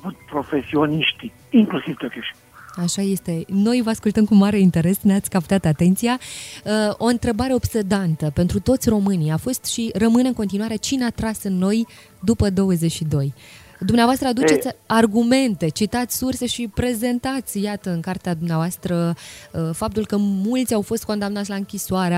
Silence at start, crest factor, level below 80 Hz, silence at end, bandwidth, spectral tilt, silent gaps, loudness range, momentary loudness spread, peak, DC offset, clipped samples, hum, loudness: 0.05 s; 18 dB; -44 dBFS; 0 s; 16 kHz; -5.5 dB/octave; none; 5 LU; 9 LU; -2 dBFS; under 0.1%; under 0.1%; none; -20 LUFS